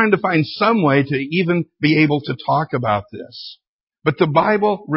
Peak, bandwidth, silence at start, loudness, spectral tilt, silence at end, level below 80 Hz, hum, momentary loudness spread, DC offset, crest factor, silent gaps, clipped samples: 0 dBFS; 5.8 kHz; 0 s; -17 LUFS; -11 dB/octave; 0 s; -56 dBFS; none; 14 LU; under 0.1%; 18 dB; 3.67-3.87 s; under 0.1%